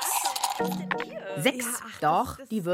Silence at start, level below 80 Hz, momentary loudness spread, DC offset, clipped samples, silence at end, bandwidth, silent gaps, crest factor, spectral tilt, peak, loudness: 0 s; -60 dBFS; 6 LU; under 0.1%; under 0.1%; 0 s; 16.5 kHz; none; 20 dB; -3 dB/octave; -10 dBFS; -28 LUFS